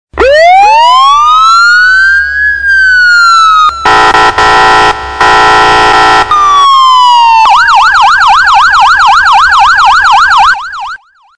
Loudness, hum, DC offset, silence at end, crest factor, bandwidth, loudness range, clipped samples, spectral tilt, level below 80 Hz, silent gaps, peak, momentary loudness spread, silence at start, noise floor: -3 LUFS; none; 3%; 0.4 s; 4 dB; 11 kHz; 1 LU; 5%; -1.5 dB/octave; -32 dBFS; none; 0 dBFS; 4 LU; 0.15 s; -25 dBFS